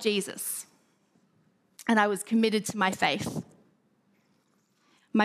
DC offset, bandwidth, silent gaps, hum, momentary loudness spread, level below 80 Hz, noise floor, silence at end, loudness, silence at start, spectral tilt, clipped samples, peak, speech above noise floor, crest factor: under 0.1%; 15.5 kHz; none; none; 12 LU; -72 dBFS; -70 dBFS; 0 s; -28 LUFS; 0 s; -4 dB/octave; under 0.1%; -8 dBFS; 42 dB; 22 dB